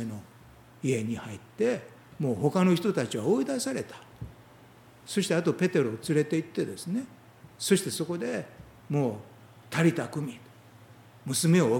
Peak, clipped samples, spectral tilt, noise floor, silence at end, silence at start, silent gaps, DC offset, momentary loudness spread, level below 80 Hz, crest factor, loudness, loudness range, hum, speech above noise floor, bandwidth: -10 dBFS; under 0.1%; -5.5 dB/octave; -54 dBFS; 0 s; 0 s; none; under 0.1%; 19 LU; -64 dBFS; 20 dB; -29 LUFS; 3 LU; none; 26 dB; 18.5 kHz